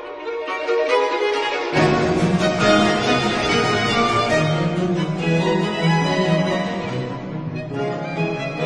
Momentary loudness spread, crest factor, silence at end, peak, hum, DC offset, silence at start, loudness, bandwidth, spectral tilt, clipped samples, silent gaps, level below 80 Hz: 9 LU; 16 dB; 0 s; -4 dBFS; none; under 0.1%; 0 s; -19 LUFS; 10.5 kHz; -5.5 dB/octave; under 0.1%; none; -44 dBFS